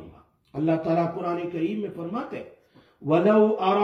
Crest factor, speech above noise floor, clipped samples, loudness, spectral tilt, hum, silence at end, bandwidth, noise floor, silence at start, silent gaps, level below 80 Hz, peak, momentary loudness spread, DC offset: 18 dB; 27 dB; under 0.1%; -24 LUFS; -9 dB/octave; none; 0 s; 6.6 kHz; -51 dBFS; 0 s; none; -66 dBFS; -8 dBFS; 17 LU; under 0.1%